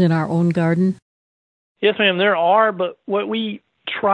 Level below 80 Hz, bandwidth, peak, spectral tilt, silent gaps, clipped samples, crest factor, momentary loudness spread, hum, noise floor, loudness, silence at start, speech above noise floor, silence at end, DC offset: -66 dBFS; 8.6 kHz; -4 dBFS; -7.5 dB/octave; 1.02-1.75 s; under 0.1%; 16 dB; 12 LU; none; under -90 dBFS; -18 LUFS; 0 s; over 73 dB; 0 s; under 0.1%